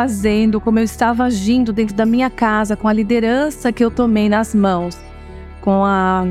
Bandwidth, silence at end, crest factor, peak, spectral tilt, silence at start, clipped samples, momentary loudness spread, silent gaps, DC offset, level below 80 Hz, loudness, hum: 14 kHz; 0 s; 14 dB; -2 dBFS; -6 dB/octave; 0 s; under 0.1%; 7 LU; none; under 0.1%; -36 dBFS; -16 LUFS; none